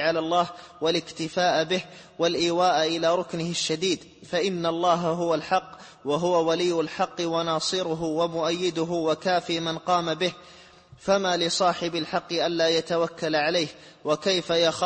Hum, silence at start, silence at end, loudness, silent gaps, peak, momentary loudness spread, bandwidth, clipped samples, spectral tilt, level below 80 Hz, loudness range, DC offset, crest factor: none; 0 s; 0 s; -25 LUFS; none; -8 dBFS; 6 LU; 8.8 kHz; under 0.1%; -4 dB/octave; -64 dBFS; 1 LU; under 0.1%; 16 dB